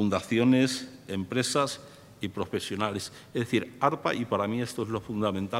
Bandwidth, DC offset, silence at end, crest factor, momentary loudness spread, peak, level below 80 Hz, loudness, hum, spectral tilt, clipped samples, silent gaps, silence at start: 16 kHz; under 0.1%; 0 s; 20 dB; 11 LU; -8 dBFS; -66 dBFS; -29 LUFS; none; -5 dB/octave; under 0.1%; none; 0 s